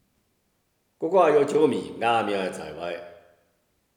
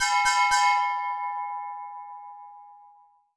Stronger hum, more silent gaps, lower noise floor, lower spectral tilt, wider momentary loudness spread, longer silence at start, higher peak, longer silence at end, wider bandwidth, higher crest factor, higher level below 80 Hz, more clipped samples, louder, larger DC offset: neither; neither; first, -71 dBFS vs -57 dBFS; first, -5.5 dB/octave vs 3.5 dB/octave; second, 15 LU vs 22 LU; first, 1 s vs 0 s; first, -6 dBFS vs -10 dBFS; first, 0.85 s vs 0.6 s; first, 12.5 kHz vs 11 kHz; about the same, 20 dB vs 16 dB; second, -68 dBFS vs -62 dBFS; neither; about the same, -24 LUFS vs -24 LUFS; neither